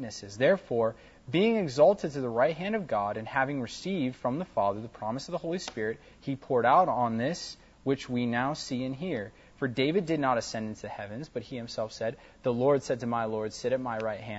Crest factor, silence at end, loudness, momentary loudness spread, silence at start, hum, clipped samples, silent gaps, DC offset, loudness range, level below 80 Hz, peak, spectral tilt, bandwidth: 18 dB; 0 s; -30 LUFS; 14 LU; 0 s; none; under 0.1%; none; under 0.1%; 4 LU; -62 dBFS; -10 dBFS; -5.5 dB/octave; 8 kHz